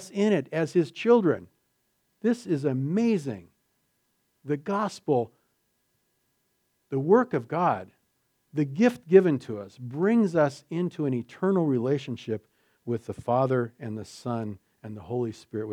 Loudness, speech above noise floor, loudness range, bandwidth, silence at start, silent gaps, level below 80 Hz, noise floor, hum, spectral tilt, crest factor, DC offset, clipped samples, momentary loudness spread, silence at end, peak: -26 LUFS; 48 dB; 6 LU; 11.5 kHz; 0 s; none; -72 dBFS; -74 dBFS; none; -7.5 dB/octave; 22 dB; under 0.1%; under 0.1%; 15 LU; 0 s; -4 dBFS